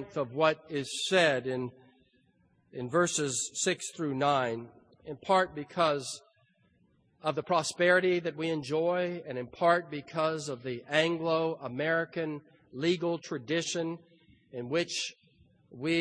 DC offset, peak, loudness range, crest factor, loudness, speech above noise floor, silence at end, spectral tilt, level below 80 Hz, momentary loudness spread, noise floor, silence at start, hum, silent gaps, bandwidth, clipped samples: under 0.1%; -10 dBFS; 4 LU; 20 dB; -30 LUFS; 38 dB; 0 s; -4 dB/octave; -72 dBFS; 13 LU; -69 dBFS; 0 s; none; none; 10.5 kHz; under 0.1%